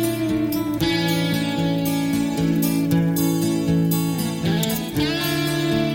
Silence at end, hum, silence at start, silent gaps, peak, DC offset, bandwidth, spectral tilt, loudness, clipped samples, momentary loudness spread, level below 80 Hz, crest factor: 0 s; none; 0 s; none; -6 dBFS; under 0.1%; 17 kHz; -5.5 dB/octave; -21 LUFS; under 0.1%; 3 LU; -44 dBFS; 14 dB